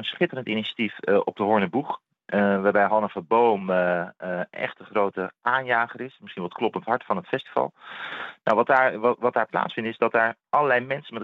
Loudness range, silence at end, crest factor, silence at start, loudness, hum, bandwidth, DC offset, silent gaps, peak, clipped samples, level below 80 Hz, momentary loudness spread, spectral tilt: 4 LU; 0 s; 20 dB; 0 s; -24 LUFS; none; 6 kHz; under 0.1%; none; -6 dBFS; under 0.1%; -78 dBFS; 11 LU; -7.5 dB/octave